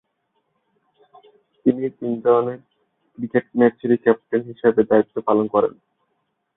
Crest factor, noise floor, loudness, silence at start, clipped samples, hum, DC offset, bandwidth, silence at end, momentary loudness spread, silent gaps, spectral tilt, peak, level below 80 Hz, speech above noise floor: 20 dB; -72 dBFS; -20 LUFS; 1.65 s; under 0.1%; none; under 0.1%; 3.9 kHz; 0.85 s; 8 LU; none; -12 dB/octave; -2 dBFS; -66 dBFS; 53 dB